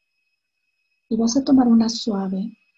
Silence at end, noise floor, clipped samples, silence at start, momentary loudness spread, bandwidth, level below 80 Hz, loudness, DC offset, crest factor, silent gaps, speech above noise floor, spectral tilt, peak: 0.25 s; -75 dBFS; under 0.1%; 1.1 s; 12 LU; 7.8 kHz; -58 dBFS; -20 LUFS; under 0.1%; 14 dB; none; 56 dB; -5.5 dB/octave; -6 dBFS